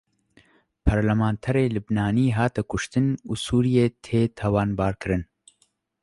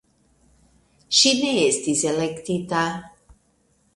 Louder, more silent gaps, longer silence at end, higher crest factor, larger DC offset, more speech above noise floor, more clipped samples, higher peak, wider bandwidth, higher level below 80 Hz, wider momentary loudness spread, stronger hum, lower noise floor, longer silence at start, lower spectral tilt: second, -24 LUFS vs -20 LUFS; neither; about the same, 0.8 s vs 0.9 s; about the same, 20 dB vs 20 dB; neither; about the same, 45 dB vs 43 dB; neither; about the same, -4 dBFS vs -4 dBFS; about the same, 11.5 kHz vs 11.5 kHz; first, -38 dBFS vs -60 dBFS; second, 6 LU vs 11 LU; neither; first, -68 dBFS vs -64 dBFS; second, 0.85 s vs 1.1 s; first, -7 dB/octave vs -2.5 dB/octave